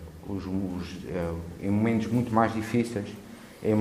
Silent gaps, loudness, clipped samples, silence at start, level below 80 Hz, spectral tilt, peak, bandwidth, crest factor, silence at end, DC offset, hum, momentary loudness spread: none; -29 LUFS; under 0.1%; 0 s; -52 dBFS; -7.5 dB/octave; -8 dBFS; 15 kHz; 20 dB; 0 s; under 0.1%; none; 11 LU